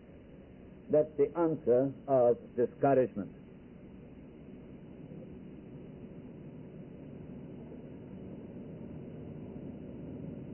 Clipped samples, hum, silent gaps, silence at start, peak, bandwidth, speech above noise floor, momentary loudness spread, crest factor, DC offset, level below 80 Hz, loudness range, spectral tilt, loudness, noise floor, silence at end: under 0.1%; none; none; 0.1 s; -16 dBFS; 3 kHz; 24 dB; 23 LU; 20 dB; under 0.1%; -62 dBFS; 19 LU; -6 dB/octave; -31 LUFS; -53 dBFS; 0 s